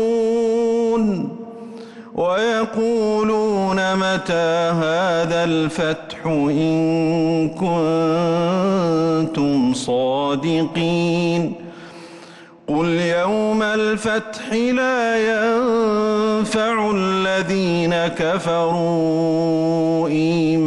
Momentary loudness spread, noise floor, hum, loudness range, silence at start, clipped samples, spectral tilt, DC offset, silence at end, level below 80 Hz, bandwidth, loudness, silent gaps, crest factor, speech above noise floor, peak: 5 LU; -42 dBFS; none; 2 LU; 0 s; under 0.1%; -6 dB/octave; under 0.1%; 0 s; -52 dBFS; 11.5 kHz; -19 LUFS; none; 8 dB; 24 dB; -10 dBFS